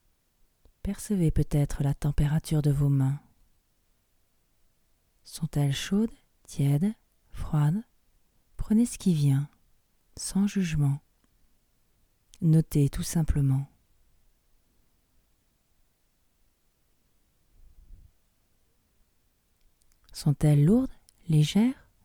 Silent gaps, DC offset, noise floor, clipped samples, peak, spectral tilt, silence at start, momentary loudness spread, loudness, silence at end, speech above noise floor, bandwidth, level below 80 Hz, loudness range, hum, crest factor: none; under 0.1%; -69 dBFS; under 0.1%; -12 dBFS; -7 dB/octave; 0.85 s; 14 LU; -27 LUFS; 0.3 s; 45 dB; 16.5 kHz; -44 dBFS; 5 LU; none; 18 dB